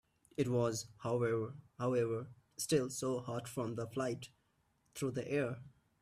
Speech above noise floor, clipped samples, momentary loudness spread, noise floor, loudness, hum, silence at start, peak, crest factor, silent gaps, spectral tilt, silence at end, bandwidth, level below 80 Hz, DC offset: 40 dB; under 0.1%; 12 LU; -77 dBFS; -38 LUFS; none; 0.4 s; -20 dBFS; 18 dB; none; -5.5 dB/octave; 0.3 s; 15.5 kHz; -72 dBFS; under 0.1%